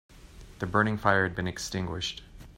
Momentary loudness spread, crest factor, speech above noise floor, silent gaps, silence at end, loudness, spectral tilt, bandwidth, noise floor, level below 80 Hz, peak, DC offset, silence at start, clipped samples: 11 LU; 22 dB; 21 dB; none; 0.05 s; -29 LUFS; -4.5 dB/octave; 16 kHz; -49 dBFS; -50 dBFS; -8 dBFS; under 0.1%; 0.1 s; under 0.1%